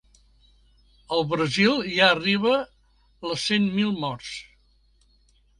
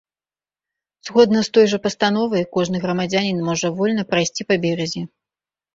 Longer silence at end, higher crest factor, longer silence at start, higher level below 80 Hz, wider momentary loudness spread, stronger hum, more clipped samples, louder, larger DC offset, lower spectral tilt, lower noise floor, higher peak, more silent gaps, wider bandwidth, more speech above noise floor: first, 1.15 s vs 0.7 s; first, 24 dB vs 18 dB; about the same, 1.1 s vs 1.05 s; about the same, -58 dBFS vs -58 dBFS; first, 17 LU vs 8 LU; neither; neither; second, -23 LUFS vs -19 LUFS; neither; about the same, -4.5 dB/octave vs -5 dB/octave; second, -61 dBFS vs under -90 dBFS; about the same, -2 dBFS vs -2 dBFS; neither; first, 11.5 kHz vs 7.8 kHz; second, 38 dB vs over 72 dB